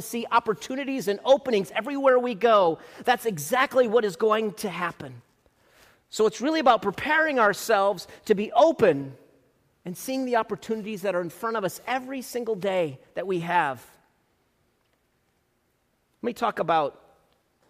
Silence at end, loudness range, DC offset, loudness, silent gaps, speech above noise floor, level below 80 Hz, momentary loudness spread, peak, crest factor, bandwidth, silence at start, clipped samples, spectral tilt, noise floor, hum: 0.8 s; 9 LU; under 0.1%; -25 LUFS; none; 46 dB; -66 dBFS; 11 LU; -6 dBFS; 20 dB; 15.5 kHz; 0 s; under 0.1%; -4.5 dB/octave; -71 dBFS; none